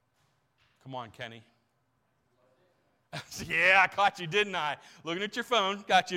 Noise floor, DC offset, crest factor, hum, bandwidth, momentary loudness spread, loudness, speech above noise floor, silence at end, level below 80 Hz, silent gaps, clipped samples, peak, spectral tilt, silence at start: -75 dBFS; under 0.1%; 22 dB; none; 16.5 kHz; 22 LU; -27 LUFS; 46 dB; 0 s; -68 dBFS; none; under 0.1%; -10 dBFS; -3 dB/octave; 0.85 s